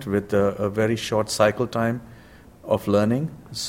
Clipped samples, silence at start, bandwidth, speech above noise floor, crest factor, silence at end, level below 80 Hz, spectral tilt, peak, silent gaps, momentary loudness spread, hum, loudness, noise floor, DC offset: under 0.1%; 0 s; 16.5 kHz; 25 dB; 20 dB; 0 s; -52 dBFS; -5.5 dB/octave; -4 dBFS; none; 7 LU; none; -23 LUFS; -47 dBFS; under 0.1%